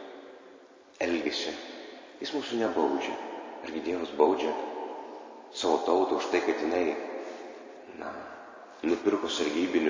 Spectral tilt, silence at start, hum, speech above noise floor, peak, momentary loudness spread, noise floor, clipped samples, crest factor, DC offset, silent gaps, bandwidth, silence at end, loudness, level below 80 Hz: -3.5 dB/octave; 0 s; none; 25 dB; -8 dBFS; 19 LU; -54 dBFS; under 0.1%; 22 dB; under 0.1%; none; 7.6 kHz; 0 s; -30 LUFS; -68 dBFS